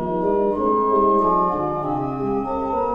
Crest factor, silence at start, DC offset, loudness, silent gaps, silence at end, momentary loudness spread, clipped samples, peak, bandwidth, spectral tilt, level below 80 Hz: 12 dB; 0 s; under 0.1%; -20 LUFS; none; 0 s; 7 LU; under 0.1%; -8 dBFS; 5.4 kHz; -10 dB/octave; -44 dBFS